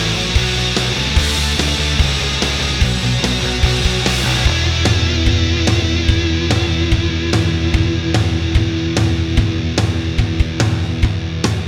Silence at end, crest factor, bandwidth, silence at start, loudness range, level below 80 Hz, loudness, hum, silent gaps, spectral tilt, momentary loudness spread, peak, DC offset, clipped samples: 0 s; 14 dB; 15.5 kHz; 0 s; 2 LU; -22 dBFS; -16 LUFS; none; none; -4.5 dB/octave; 3 LU; -2 dBFS; under 0.1%; under 0.1%